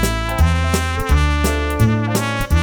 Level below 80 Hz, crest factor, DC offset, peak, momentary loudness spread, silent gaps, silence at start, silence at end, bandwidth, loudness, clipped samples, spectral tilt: -20 dBFS; 14 dB; under 0.1%; -2 dBFS; 3 LU; none; 0 s; 0 s; over 20 kHz; -17 LUFS; under 0.1%; -5.5 dB/octave